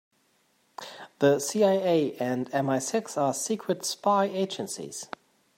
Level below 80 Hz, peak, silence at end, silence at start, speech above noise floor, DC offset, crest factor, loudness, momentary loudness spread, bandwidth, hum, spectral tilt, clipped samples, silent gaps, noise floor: -78 dBFS; -8 dBFS; 0.5 s; 0.8 s; 42 dB; under 0.1%; 18 dB; -27 LUFS; 18 LU; 16 kHz; none; -4.5 dB/octave; under 0.1%; none; -68 dBFS